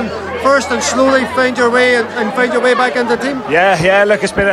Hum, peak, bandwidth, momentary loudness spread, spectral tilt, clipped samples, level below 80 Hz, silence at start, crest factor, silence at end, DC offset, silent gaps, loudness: none; 0 dBFS; 13 kHz; 5 LU; -4 dB/octave; under 0.1%; -42 dBFS; 0 s; 12 dB; 0 s; under 0.1%; none; -12 LUFS